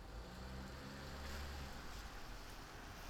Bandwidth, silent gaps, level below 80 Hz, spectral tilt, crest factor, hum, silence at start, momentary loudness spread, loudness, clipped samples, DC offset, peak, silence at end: over 20 kHz; none; -54 dBFS; -4.5 dB/octave; 14 dB; none; 0 s; 5 LU; -52 LUFS; under 0.1%; under 0.1%; -36 dBFS; 0 s